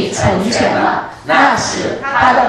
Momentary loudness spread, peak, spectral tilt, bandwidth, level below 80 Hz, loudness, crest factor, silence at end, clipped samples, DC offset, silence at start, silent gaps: 7 LU; 0 dBFS; -4 dB/octave; 12.5 kHz; -40 dBFS; -13 LUFS; 14 dB; 0 s; under 0.1%; under 0.1%; 0 s; none